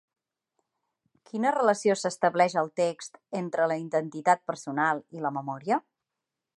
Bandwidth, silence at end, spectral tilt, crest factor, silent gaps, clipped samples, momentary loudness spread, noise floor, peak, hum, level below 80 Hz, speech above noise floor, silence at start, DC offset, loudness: 11.5 kHz; 0.8 s; -5 dB/octave; 20 dB; none; under 0.1%; 9 LU; -87 dBFS; -8 dBFS; none; -82 dBFS; 60 dB; 1.35 s; under 0.1%; -27 LUFS